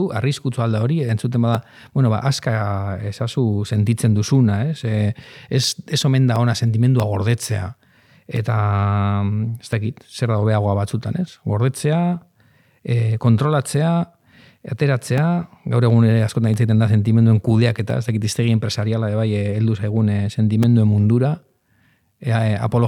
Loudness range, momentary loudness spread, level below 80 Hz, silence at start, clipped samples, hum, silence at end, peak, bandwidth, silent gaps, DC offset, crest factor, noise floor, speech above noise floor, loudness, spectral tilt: 4 LU; 9 LU; -54 dBFS; 0 s; under 0.1%; none; 0 s; -2 dBFS; 12.5 kHz; none; under 0.1%; 16 dB; -60 dBFS; 42 dB; -19 LUFS; -7 dB/octave